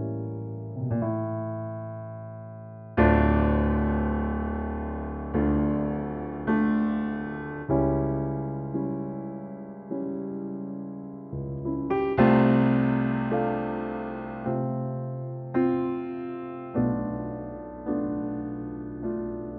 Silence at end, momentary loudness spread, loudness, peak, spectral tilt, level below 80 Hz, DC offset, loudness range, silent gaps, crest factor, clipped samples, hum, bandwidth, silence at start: 0 s; 14 LU; -28 LUFS; -6 dBFS; -8 dB/octave; -38 dBFS; under 0.1%; 7 LU; none; 22 dB; under 0.1%; none; 4.7 kHz; 0 s